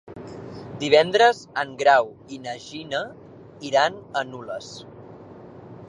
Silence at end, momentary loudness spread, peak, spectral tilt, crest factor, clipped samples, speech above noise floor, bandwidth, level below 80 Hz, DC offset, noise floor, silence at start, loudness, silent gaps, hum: 0.05 s; 25 LU; -2 dBFS; -3.5 dB/octave; 22 dB; under 0.1%; 21 dB; 10.5 kHz; -62 dBFS; under 0.1%; -43 dBFS; 0.1 s; -21 LUFS; none; none